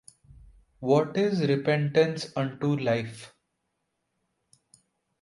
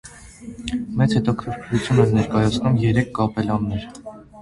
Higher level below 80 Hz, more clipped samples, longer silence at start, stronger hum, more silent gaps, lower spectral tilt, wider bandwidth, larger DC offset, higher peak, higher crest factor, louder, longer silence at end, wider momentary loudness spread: second, -64 dBFS vs -42 dBFS; neither; first, 0.8 s vs 0.05 s; neither; neither; about the same, -7 dB/octave vs -7 dB/octave; about the same, 11.5 kHz vs 11.5 kHz; neither; second, -10 dBFS vs -2 dBFS; about the same, 20 dB vs 18 dB; second, -26 LUFS vs -21 LUFS; first, 1.95 s vs 0 s; second, 10 LU vs 21 LU